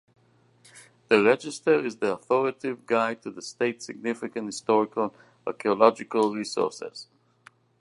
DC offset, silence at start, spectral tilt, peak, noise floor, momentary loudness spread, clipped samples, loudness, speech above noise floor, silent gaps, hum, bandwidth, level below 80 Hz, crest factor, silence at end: under 0.1%; 0.75 s; -4.5 dB/octave; -4 dBFS; -61 dBFS; 15 LU; under 0.1%; -26 LUFS; 35 dB; none; none; 11.5 kHz; -74 dBFS; 22 dB; 0.75 s